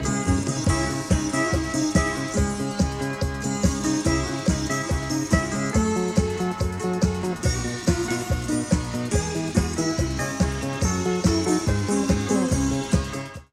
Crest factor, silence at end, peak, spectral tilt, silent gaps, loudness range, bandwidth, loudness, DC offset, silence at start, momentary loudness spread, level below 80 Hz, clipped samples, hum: 18 dB; 0.1 s; -4 dBFS; -5 dB/octave; none; 1 LU; 15 kHz; -24 LUFS; under 0.1%; 0 s; 4 LU; -34 dBFS; under 0.1%; none